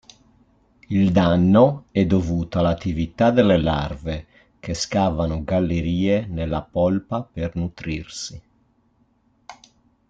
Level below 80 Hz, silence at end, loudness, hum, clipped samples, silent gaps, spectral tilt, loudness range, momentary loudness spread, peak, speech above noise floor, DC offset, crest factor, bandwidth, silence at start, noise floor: -42 dBFS; 0.55 s; -21 LUFS; none; under 0.1%; none; -7 dB/octave; 8 LU; 14 LU; -4 dBFS; 42 dB; under 0.1%; 18 dB; 7.8 kHz; 0.9 s; -62 dBFS